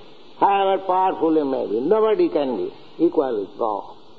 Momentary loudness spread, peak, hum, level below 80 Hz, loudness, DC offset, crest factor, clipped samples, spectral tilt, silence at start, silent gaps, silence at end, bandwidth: 7 LU; -6 dBFS; none; -62 dBFS; -21 LUFS; 0.7%; 16 dB; under 0.1%; -4 dB/octave; 0 s; none; 0.25 s; 5 kHz